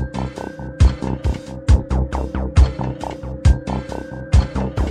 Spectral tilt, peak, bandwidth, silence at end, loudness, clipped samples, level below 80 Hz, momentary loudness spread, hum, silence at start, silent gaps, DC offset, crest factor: -7.5 dB/octave; -2 dBFS; 9.8 kHz; 0 s; -20 LUFS; under 0.1%; -20 dBFS; 11 LU; none; 0 s; none; under 0.1%; 16 dB